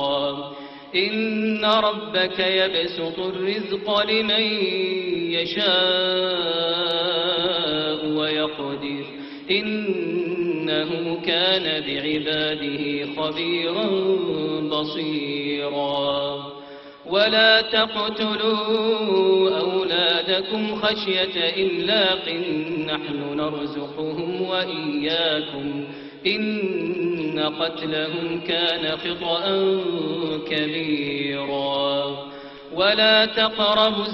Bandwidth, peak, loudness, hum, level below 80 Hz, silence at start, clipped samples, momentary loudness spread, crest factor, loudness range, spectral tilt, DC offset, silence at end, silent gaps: 6.2 kHz; -4 dBFS; -22 LUFS; none; -60 dBFS; 0 s; under 0.1%; 9 LU; 20 dB; 4 LU; -6.5 dB/octave; under 0.1%; 0 s; none